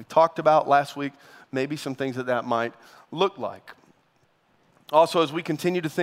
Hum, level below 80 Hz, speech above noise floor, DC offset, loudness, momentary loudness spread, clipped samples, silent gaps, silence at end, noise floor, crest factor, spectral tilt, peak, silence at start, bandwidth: none; -76 dBFS; 41 dB; under 0.1%; -24 LUFS; 14 LU; under 0.1%; none; 0 s; -65 dBFS; 20 dB; -5.5 dB/octave; -6 dBFS; 0 s; 16 kHz